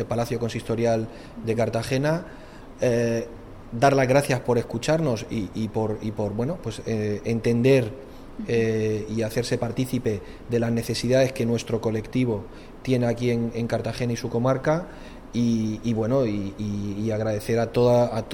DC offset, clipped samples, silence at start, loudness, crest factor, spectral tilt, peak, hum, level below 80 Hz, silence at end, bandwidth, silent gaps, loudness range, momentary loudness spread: under 0.1%; under 0.1%; 0 s; -25 LUFS; 18 dB; -6.5 dB/octave; -6 dBFS; none; -46 dBFS; 0 s; 18 kHz; none; 2 LU; 11 LU